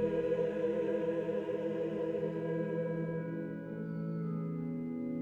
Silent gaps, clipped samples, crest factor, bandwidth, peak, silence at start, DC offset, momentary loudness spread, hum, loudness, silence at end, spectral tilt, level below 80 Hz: none; under 0.1%; 14 dB; 7 kHz; -22 dBFS; 0 s; under 0.1%; 6 LU; none; -36 LUFS; 0 s; -9.5 dB/octave; -68 dBFS